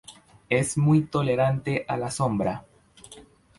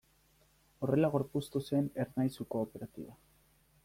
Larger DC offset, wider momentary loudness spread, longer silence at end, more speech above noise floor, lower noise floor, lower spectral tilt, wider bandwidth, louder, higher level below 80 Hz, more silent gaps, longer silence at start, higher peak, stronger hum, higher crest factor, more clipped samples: neither; second, 8 LU vs 16 LU; second, 0.35 s vs 0.7 s; second, 27 dB vs 35 dB; second, -50 dBFS vs -69 dBFS; second, -6 dB/octave vs -8 dB/octave; second, 11.5 kHz vs 16.5 kHz; first, -25 LUFS vs -35 LUFS; first, -54 dBFS vs -66 dBFS; neither; second, 0.1 s vs 0.8 s; first, -8 dBFS vs -18 dBFS; neither; about the same, 16 dB vs 18 dB; neither